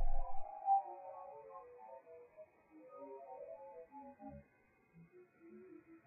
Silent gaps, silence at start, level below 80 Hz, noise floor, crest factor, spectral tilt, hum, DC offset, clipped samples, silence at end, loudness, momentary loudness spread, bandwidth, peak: none; 0 s; -46 dBFS; -73 dBFS; 16 dB; -4 dB/octave; none; under 0.1%; under 0.1%; 0.5 s; -45 LUFS; 26 LU; 2.6 kHz; -24 dBFS